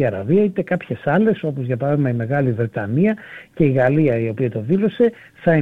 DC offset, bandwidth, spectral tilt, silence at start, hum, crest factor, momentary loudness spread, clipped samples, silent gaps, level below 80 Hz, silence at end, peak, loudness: under 0.1%; 4.4 kHz; -10 dB/octave; 0 s; none; 14 dB; 7 LU; under 0.1%; none; -54 dBFS; 0 s; -4 dBFS; -19 LUFS